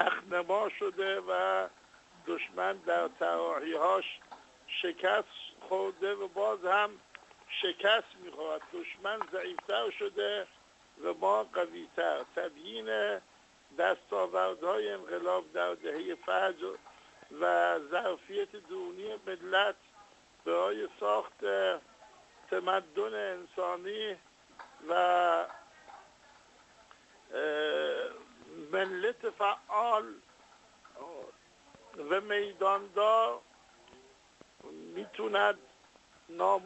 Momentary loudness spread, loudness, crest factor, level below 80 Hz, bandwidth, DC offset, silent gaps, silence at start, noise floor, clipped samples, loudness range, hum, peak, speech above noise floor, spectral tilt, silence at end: 18 LU; -33 LUFS; 24 dB; -78 dBFS; 8.2 kHz; under 0.1%; none; 0 s; -62 dBFS; under 0.1%; 3 LU; none; -10 dBFS; 29 dB; -3 dB/octave; 0 s